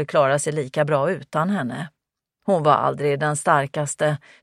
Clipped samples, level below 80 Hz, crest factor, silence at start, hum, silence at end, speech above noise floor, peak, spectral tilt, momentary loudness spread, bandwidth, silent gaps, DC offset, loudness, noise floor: under 0.1%; -66 dBFS; 18 dB; 0 s; none; 0.25 s; 54 dB; -2 dBFS; -5 dB/octave; 8 LU; 14 kHz; none; under 0.1%; -21 LUFS; -75 dBFS